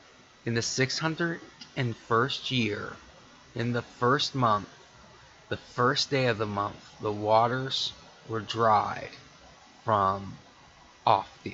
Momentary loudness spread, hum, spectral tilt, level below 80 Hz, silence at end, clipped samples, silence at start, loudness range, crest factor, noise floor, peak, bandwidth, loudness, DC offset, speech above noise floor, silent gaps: 15 LU; none; -4.5 dB/octave; -62 dBFS; 0 s; under 0.1%; 0.45 s; 2 LU; 22 dB; -55 dBFS; -6 dBFS; 8 kHz; -28 LUFS; under 0.1%; 27 dB; none